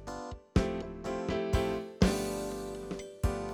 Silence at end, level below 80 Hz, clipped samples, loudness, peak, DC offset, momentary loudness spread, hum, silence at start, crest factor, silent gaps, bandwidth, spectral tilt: 0 s; -40 dBFS; under 0.1%; -34 LUFS; -12 dBFS; under 0.1%; 11 LU; none; 0 s; 22 dB; none; 18 kHz; -6 dB/octave